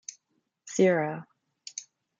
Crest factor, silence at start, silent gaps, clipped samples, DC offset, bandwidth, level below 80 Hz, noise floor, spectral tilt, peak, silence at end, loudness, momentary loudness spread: 20 dB; 0.65 s; none; under 0.1%; under 0.1%; 9.2 kHz; -78 dBFS; -77 dBFS; -5 dB/octave; -10 dBFS; 0.35 s; -26 LUFS; 20 LU